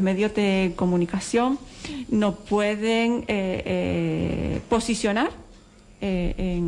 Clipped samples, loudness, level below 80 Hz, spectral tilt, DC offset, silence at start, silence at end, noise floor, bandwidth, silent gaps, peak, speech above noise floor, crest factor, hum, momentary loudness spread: under 0.1%; -24 LUFS; -40 dBFS; -6 dB/octave; under 0.1%; 0 s; 0 s; -50 dBFS; 11.5 kHz; none; -12 dBFS; 26 dB; 12 dB; none; 6 LU